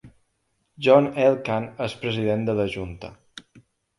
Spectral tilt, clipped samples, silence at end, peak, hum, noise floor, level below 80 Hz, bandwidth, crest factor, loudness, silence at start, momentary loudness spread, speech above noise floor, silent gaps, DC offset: -7 dB/octave; under 0.1%; 0.4 s; -2 dBFS; none; -72 dBFS; -54 dBFS; 11.5 kHz; 22 dB; -22 LUFS; 0.05 s; 17 LU; 50 dB; none; under 0.1%